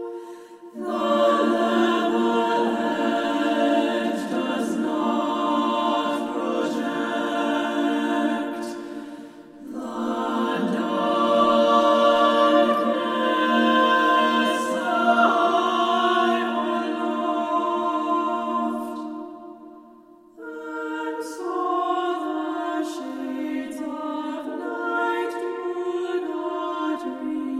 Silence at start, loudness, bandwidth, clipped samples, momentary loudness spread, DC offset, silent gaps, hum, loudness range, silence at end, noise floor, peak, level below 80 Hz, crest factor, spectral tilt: 0 s; -23 LUFS; 15.5 kHz; under 0.1%; 14 LU; under 0.1%; none; none; 9 LU; 0 s; -50 dBFS; -6 dBFS; -68 dBFS; 18 dB; -4.5 dB/octave